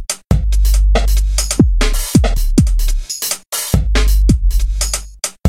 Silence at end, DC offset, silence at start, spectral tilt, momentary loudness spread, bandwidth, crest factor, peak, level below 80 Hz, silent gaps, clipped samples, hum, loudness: 0 s; under 0.1%; 0 s; -4.5 dB/octave; 5 LU; 16.5 kHz; 12 dB; 0 dBFS; -14 dBFS; none; under 0.1%; none; -16 LUFS